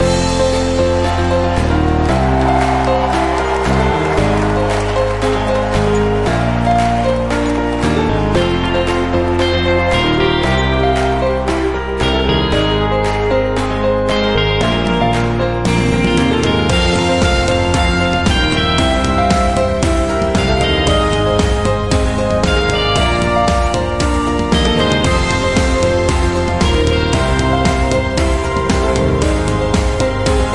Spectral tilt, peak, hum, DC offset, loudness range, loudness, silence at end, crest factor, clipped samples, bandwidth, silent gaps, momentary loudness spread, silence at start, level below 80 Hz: -5.5 dB/octave; 0 dBFS; none; 2%; 1 LU; -14 LUFS; 0 s; 12 dB; under 0.1%; 11.5 kHz; none; 2 LU; 0 s; -22 dBFS